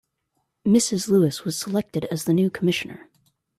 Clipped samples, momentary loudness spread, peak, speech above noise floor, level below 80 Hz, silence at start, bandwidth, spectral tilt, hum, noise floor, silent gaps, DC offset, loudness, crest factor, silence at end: under 0.1%; 8 LU; -8 dBFS; 53 dB; -62 dBFS; 0.65 s; 14.5 kHz; -5 dB/octave; none; -75 dBFS; none; under 0.1%; -22 LUFS; 16 dB; 0.6 s